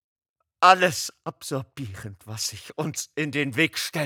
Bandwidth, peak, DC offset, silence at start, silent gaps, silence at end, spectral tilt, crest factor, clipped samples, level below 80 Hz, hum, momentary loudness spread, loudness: over 20 kHz; -2 dBFS; under 0.1%; 0.6 s; none; 0 s; -3.5 dB/octave; 24 dB; under 0.1%; -68 dBFS; none; 19 LU; -24 LUFS